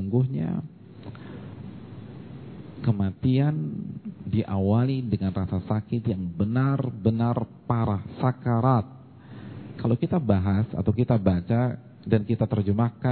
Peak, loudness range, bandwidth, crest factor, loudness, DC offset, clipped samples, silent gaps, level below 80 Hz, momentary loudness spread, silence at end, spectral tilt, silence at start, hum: -6 dBFS; 5 LU; 4.5 kHz; 20 dB; -26 LUFS; under 0.1%; under 0.1%; none; -52 dBFS; 18 LU; 0 s; -12.5 dB/octave; 0 s; none